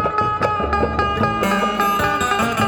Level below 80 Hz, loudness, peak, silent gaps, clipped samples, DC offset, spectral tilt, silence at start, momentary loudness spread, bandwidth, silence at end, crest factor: -36 dBFS; -18 LUFS; -4 dBFS; none; under 0.1%; under 0.1%; -5 dB/octave; 0 s; 2 LU; 19 kHz; 0 s; 14 dB